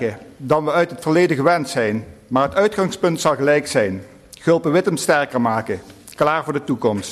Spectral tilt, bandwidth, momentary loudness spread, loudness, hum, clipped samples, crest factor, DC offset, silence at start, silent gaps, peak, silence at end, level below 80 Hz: -5.5 dB/octave; 13.5 kHz; 9 LU; -19 LUFS; none; under 0.1%; 14 dB; under 0.1%; 0 s; none; -4 dBFS; 0 s; -54 dBFS